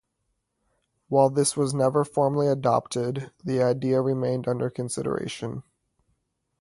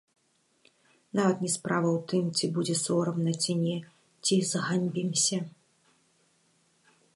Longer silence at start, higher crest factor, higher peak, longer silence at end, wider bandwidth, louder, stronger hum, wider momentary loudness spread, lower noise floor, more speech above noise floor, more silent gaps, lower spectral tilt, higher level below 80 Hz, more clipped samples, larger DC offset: about the same, 1.1 s vs 1.15 s; about the same, 20 dB vs 18 dB; first, -6 dBFS vs -12 dBFS; second, 1 s vs 1.65 s; about the same, 11.5 kHz vs 11.5 kHz; first, -25 LUFS vs -28 LUFS; neither; first, 9 LU vs 6 LU; first, -77 dBFS vs -68 dBFS; first, 53 dB vs 40 dB; neither; first, -6 dB/octave vs -4.5 dB/octave; first, -62 dBFS vs -76 dBFS; neither; neither